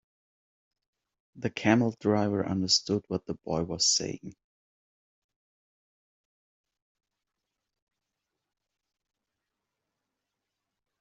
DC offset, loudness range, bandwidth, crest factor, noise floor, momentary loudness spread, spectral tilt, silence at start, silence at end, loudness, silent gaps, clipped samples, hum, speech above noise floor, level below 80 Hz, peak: under 0.1%; 6 LU; 8 kHz; 26 dB; -86 dBFS; 11 LU; -4 dB/octave; 1.35 s; 6.7 s; -28 LUFS; none; under 0.1%; none; 58 dB; -66 dBFS; -8 dBFS